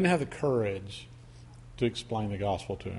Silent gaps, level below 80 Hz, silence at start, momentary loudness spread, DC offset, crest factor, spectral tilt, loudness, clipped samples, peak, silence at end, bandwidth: none; -54 dBFS; 0 s; 22 LU; under 0.1%; 18 dB; -6.5 dB/octave; -31 LUFS; under 0.1%; -14 dBFS; 0 s; 11.5 kHz